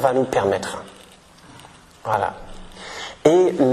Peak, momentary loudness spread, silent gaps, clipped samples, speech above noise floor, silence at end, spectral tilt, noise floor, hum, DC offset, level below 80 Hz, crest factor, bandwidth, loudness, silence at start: -2 dBFS; 23 LU; none; under 0.1%; 28 dB; 0 s; -5.5 dB/octave; -47 dBFS; none; under 0.1%; -48 dBFS; 20 dB; 13 kHz; -20 LUFS; 0 s